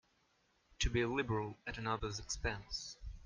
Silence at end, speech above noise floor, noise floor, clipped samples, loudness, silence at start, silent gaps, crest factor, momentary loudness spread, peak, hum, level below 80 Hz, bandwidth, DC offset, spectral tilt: 0 s; 36 dB; -76 dBFS; under 0.1%; -40 LUFS; 0.8 s; none; 18 dB; 8 LU; -22 dBFS; none; -48 dBFS; 10 kHz; under 0.1%; -4 dB/octave